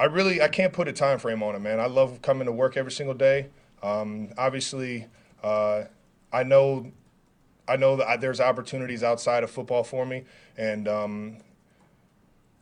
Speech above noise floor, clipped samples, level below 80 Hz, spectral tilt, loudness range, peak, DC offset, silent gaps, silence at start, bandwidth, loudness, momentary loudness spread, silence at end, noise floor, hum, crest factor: 37 dB; under 0.1%; -64 dBFS; -5 dB/octave; 4 LU; -6 dBFS; under 0.1%; none; 0 s; 10.5 kHz; -25 LUFS; 12 LU; 1.2 s; -62 dBFS; none; 20 dB